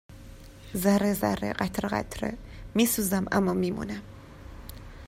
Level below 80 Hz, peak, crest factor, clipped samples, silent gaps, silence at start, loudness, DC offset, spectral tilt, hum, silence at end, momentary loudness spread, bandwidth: -48 dBFS; -10 dBFS; 18 dB; under 0.1%; none; 0.1 s; -28 LUFS; under 0.1%; -5 dB/octave; none; 0 s; 23 LU; 16 kHz